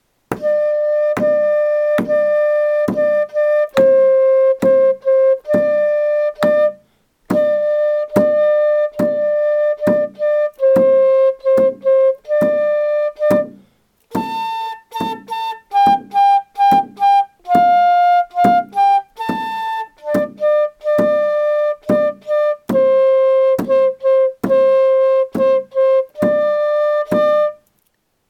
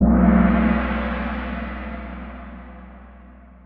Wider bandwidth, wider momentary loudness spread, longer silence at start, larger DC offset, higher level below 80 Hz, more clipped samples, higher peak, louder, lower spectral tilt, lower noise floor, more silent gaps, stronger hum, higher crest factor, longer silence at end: first, 15 kHz vs 4.6 kHz; second, 9 LU vs 24 LU; first, 0.3 s vs 0 s; neither; second, -58 dBFS vs -28 dBFS; neither; first, 0 dBFS vs -4 dBFS; first, -15 LUFS vs -20 LUFS; about the same, -6.5 dB/octave vs -7.5 dB/octave; first, -65 dBFS vs -44 dBFS; neither; second, none vs 60 Hz at -50 dBFS; about the same, 14 dB vs 16 dB; first, 0.75 s vs 0.35 s